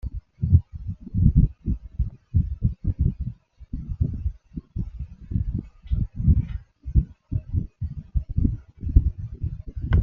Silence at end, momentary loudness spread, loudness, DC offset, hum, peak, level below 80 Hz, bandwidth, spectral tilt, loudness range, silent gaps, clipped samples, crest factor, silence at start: 0 s; 14 LU; -27 LUFS; under 0.1%; none; -2 dBFS; -28 dBFS; 3.4 kHz; -11.5 dB/octave; 5 LU; none; under 0.1%; 22 dB; 0.05 s